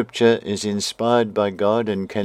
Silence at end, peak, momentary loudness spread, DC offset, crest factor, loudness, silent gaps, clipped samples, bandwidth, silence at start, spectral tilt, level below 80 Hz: 0 s; -2 dBFS; 6 LU; under 0.1%; 18 dB; -20 LUFS; none; under 0.1%; 14.5 kHz; 0 s; -5 dB/octave; -64 dBFS